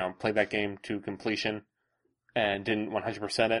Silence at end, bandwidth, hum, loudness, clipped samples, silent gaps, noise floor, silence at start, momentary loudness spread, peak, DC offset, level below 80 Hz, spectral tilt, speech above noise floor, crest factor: 0 s; 11.5 kHz; none; -31 LUFS; under 0.1%; none; -77 dBFS; 0 s; 8 LU; -10 dBFS; under 0.1%; -64 dBFS; -4.5 dB/octave; 47 dB; 20 dB